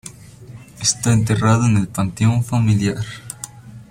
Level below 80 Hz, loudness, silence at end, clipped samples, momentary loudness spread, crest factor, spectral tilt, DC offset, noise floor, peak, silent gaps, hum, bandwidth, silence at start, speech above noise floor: -44 dBFS; -18 LUFS; 0.05 s; under 0.1%; 16 LU; 16 dB; -5 dB/octave; under 0.1%; -39 dBFS; -2 dBFS; none; none; 15.5 kHz; 0.05 s; 22 dB